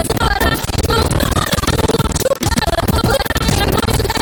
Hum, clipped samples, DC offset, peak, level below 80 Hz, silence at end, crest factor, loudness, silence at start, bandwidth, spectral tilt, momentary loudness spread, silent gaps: none; under 0.1%; under 0.1%; -2 dBFS; -22 dBFS; 0 s; 14 dB; -15 LUFS; 0 s; 19.5 kHz; -4.5 dB/octave; 1 LU; none